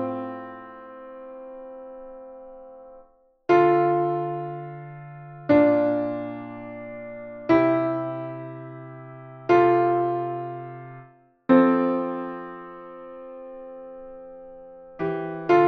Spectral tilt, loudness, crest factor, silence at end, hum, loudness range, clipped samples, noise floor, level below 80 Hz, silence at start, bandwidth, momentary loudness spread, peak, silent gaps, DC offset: -9 dB/octave; -23 LUFS; 20 dB; 0 s; none; 11 LU; under 0.1%; -56 dBFS; -62 dBFS; 0 s; 6.2 kHz; 23 LU; -4 dBFS; none; under 0.1%